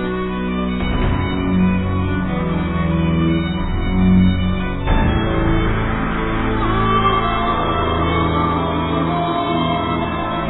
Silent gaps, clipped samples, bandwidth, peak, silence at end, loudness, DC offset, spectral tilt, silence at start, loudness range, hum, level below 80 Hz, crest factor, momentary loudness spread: none; under 0.1%; 4.1 kHz; -4 dBFS; 0 s; -18 LUFS; under 0.1%; -11.5 dB/octave; 0 s; 1 LU; none; -26 dBFS; 14 dB; 5 LU